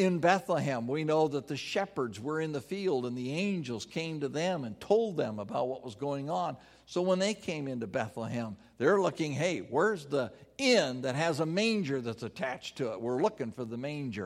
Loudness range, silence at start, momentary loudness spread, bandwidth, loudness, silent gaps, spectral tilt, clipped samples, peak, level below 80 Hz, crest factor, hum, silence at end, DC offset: 4 LU; 0 s; 10 LU; 15 kHz; -32 LUFS; none; -5.5 dB/octave; under 0.1%; -10 dBFS; -70 dBFS; 20 dB; none; 0 s; under 0.1%